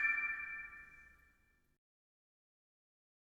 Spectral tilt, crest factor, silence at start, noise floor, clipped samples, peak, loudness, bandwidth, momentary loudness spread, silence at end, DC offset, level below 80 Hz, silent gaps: -3 dB/octave; 22 dB; 0 s; -74 dBFS; under 0.1%; -24 dBFS; -40 LUFS; 16 kHz; 23 LU; 2.25 s; under 0.1%; -74 dBFS; none